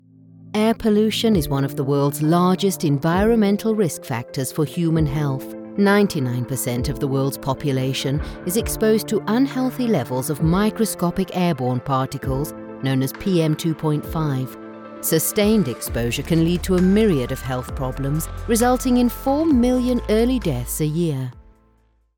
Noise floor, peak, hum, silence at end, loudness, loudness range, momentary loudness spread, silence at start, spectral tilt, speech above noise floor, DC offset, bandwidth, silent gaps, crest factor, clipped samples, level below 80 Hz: -60 dBFS; -4 dBFS; none; 0.75 s; -20 LUFS; 3 LU; 8 LU; 0.4 s; -6 dB/octave; 40 dB; under 0.1%; 19 kHz; none; 16 dB; under 0.1%; -36 dBFS